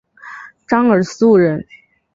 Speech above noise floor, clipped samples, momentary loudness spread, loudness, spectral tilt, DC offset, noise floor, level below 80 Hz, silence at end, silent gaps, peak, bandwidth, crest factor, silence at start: 23 dB; under 0.1%; 22 LU; -14 LUFS; -7 dB/octave; under 0.1%; -36 dBFS; -56 dBFS; 0.5 s; none; -2 dBFS; 7.8 kHz; 14 dB; 0.25 s